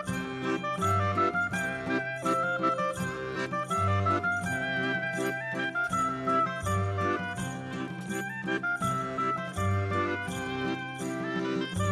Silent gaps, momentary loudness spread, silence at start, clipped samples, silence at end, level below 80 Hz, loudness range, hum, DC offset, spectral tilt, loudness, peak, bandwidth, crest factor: none; 7 LU; 0 s; under 0.1%; 0 s; -58 dBFS; 2 LU; none; under 0.1%; -5.5 dB/octave; -30 LUFS; -14 dBFS; 14 kHz; 16 dB